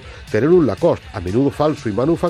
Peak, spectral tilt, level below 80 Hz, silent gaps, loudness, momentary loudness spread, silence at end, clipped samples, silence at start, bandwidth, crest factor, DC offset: -4 dBFS; -8 dB/octave; -42 dBFS; none; -17 LUFS; 8 LU; 0 s; under 0.1%; 0 s; 12 kHz; 14 dB; under 0.1%